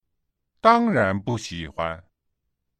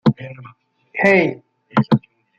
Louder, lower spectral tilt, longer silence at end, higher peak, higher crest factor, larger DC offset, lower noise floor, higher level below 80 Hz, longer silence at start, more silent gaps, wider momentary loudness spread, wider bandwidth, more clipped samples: second, -22 LUFS vs -17 LUFS; second, -6 dB/octave vs -8 dB/octave; first, 0.8 s vs 0.4 s; about the same, -2 dBFS vs -2 dBFS; about the same, 22 dB vs 18 dB; neither; first, -78 dBFS vs -46 dBFS; first, -52 dBFS vs -58 dBFS; first, 0.65 s vs 0.05 s; neither; second, 13 LU vs 19 LU; first, 9.4 kHz vs 7.6 kHz; neither